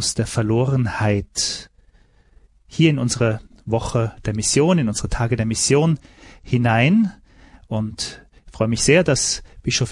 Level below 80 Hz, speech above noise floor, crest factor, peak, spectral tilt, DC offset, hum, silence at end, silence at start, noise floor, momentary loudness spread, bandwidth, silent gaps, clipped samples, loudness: -40 dBFS; 35 dB; 18 dB; -2 dBFS; -4.5 dB/octave; under 0.1%; none; 0 s; 0 s; -54 dBFS; 11 LU; 11.5 kHz; none; under 0.1%; -20 LUFS